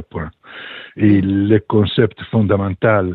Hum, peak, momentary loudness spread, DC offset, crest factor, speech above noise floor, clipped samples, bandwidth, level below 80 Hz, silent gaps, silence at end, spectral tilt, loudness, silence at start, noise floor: none; 0 dBFS; 17 LU; under 0.1%; 16 dB; 20 dB; under 0.1%; 4.4 kHz; -46 dBFS; none; 0 s; -11 dB/octave; -15 LUFS; 0 s; -35 dBFS